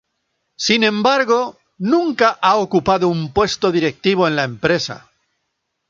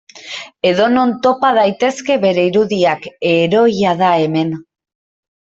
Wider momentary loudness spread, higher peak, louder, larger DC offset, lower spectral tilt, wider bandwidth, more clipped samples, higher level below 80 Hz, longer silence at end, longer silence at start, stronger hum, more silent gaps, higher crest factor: about the same, 7 LU vs 8 LU; about the same, -2 dBFS vs -2 dBFS; second, -17 LUFS vs -14 LUFS; neither; about the same, -4.5 dB/octave vs -5.5 dB/octave; about the same, 7.6 kHz vs 8 kHz; neither; first, -48 dBFS vs -58 dBFS; first, 0.95 s vs 0.8 s; first, 0.6 s vs 0.15 s; neither; neither; about the same, 16 dB vs 14 dB